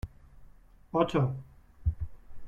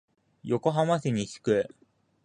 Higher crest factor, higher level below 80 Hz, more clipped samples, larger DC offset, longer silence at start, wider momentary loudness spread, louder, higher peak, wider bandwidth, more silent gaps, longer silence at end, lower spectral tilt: about the same, 22 dB vs 18 dB; first, -44 dBFS vs -64 dBFS; neither; neither; second, 0.05 s vs 0.45 s; first, 16 LU vs 9 LU; second, -32 LUFS vs -28 LUFS; about the same, -12 dBFS vs -10 dBFS; second, 9 kHz vs 10 kHz; neither; second, 0 s vs 0.6 s; first, -8.5 dB/octave vs -6.5 dB/octave